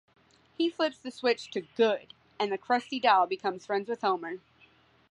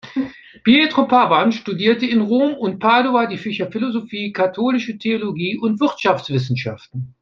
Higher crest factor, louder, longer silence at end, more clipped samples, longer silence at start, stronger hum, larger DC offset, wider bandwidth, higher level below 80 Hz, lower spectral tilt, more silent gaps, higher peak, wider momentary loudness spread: about the same, 20 dB vs 16 dB; second, -29 LUFS vs -18 LUFS; first, 0.75 s vs 0.1 s; neither; first, 0.6 s vs 0.05 s; neither; neither; first, 10.5 kHz vs 7 kHz; second, -78 dBFS vs -60 dBFS; second, -4 dB/octave vs -6.5 dB/octave; neither; second, -10 dBFS vs 0 dBFS; about the same, 10 LU vs 11 LU